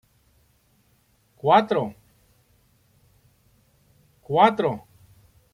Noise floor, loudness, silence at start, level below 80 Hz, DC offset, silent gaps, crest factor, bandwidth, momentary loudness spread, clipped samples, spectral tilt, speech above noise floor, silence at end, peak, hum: -64 dBFS; -21 LUFS; 1.45 s; -64 dBFS; under 0.1%; none; 24 dB; 15.5 kHz; 13 LU; under 0.1%; -7 dB/octave; 44 dB; 0.75 s; -4 dBFS; none